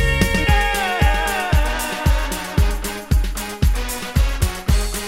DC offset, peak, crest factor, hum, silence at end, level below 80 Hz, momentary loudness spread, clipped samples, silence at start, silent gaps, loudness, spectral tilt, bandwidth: under 0.1%; -2 dBFS; 16 dB; none; 0 s; -20 dBFS; 5 LU; under 0.1%; 0 s; none; -20 LUFS; -4.5 dB/octave; 16.5 kHz